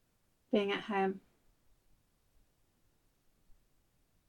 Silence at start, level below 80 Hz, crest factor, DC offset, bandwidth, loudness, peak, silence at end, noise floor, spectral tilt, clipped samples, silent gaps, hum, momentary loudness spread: 0.5 s; -74 dBFS; 24 dB; under 0.1%; 16.5 kHz; -35 LUFS; -18 dBFS; 3.1 s; -75 dBFS; -6.5 dB/octave; under 0.1%; none; none; 5 LU